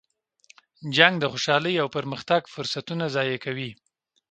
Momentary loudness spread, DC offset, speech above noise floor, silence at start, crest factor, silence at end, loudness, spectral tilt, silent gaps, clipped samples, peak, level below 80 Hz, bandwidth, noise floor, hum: 13 LU; under 0.1%; 34 dB; 0.8 s; 26 dB; 0.6 s; -24 LUFS; -4.5 dB/octave; none; under 0.1%; 0 dBFS; -68 dBFS; 9.2 kHz; -59 dBFS; none